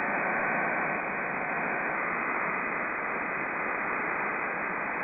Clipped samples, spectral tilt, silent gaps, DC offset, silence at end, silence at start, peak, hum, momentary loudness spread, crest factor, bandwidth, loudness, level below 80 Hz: under 0.1%; -5 dB/octave; none; under 0.1%; 0 s; 0 s; -16 dBFS; none; 3 LU; 14 dB; 4 kHz; -29 LUFS; -64 dBFS